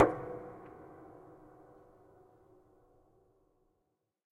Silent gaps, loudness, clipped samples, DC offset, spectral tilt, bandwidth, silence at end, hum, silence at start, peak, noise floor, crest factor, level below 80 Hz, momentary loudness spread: none; -38 LUFS; under 0.1%; under 0.1%; -8.5 dB/octave; 9.6 kHz; 3.25 s; none; 0 s; -10 dBFS; -82 dBFS; 30 dB; -68 dBFS; 20 LU